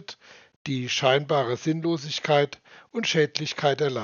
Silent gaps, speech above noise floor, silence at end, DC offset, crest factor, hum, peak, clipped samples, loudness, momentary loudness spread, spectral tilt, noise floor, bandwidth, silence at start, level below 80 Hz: 0.56-0.65 s; 21 dB; 0 s; under 0.1%; 22 dB; none; -4 dBFS; under 0.1%; -25 LUFS; 15 LU; -3.5 dB/octave; -46 dBFS; 7.2 kHz; 0.1 s; -72 dBFS